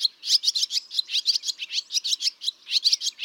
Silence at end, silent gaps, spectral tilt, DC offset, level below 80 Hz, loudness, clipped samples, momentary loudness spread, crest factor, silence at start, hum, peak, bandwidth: 0 s; none; 7 dB/octave; under 0.1%; under -90 dBFS; -23 LUFS; under 0.1%; 6 LU; 18 dB; 0 s; none; -8 dBFS; 17.5 kHz